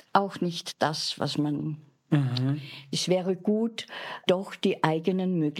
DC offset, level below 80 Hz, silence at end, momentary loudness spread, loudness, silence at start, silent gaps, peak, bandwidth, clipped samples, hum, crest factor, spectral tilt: under 0.1%; -78 dBFS; 0 s; 7 LU; -28 LUFS; 0.15 s; none; -6 dBFS; 15 kHz; under 0.1%; none; 22 dB; -5.5 dB/octave